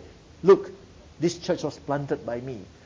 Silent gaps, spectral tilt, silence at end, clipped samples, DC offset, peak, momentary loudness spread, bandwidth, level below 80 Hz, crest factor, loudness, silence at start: none; -6.5 dB/octave; 0.2 s; under 0.1%; under 0.1%; -6 dBFS; 14 LU; 7.6 kHz; -56 dBFS; 20 dB; -25 LUFS; 0 s